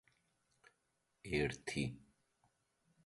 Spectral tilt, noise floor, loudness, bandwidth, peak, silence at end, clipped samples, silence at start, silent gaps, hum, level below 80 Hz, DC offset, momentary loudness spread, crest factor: -5 dB/octave; -83 dBFS; -41 LUFS; 11.5 kHz; -24 dBFS; 1.05 s; under 0.1%; 1.25 s; none; none; -64 dBFS; under 0.1%; 19 LU; 22 dB